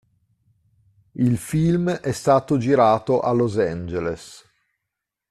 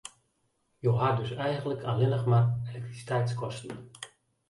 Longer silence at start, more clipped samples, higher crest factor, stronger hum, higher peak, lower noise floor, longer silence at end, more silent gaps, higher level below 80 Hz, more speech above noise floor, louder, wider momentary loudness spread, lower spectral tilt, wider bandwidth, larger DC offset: first, 1.15 s vs 0.05 s; neither; about the same, 18 dB vs 16 dB; neither; first, -4 dBFS vs -12 dBFS; first, -83 dBFS vs -75 dBFS; first, 0.95 s vs 0.4 s; neither; first, -52 dBFS vs -62 dBFS; first, 63 dB vs 46 dB; first, -21 LUFS vs -29 LUFS; second, 11 LU vs 19 LU; about the same, -7 dB/octave vs -7 dB/octave; first, 13.5 kHz vs 11.5 kHz; neither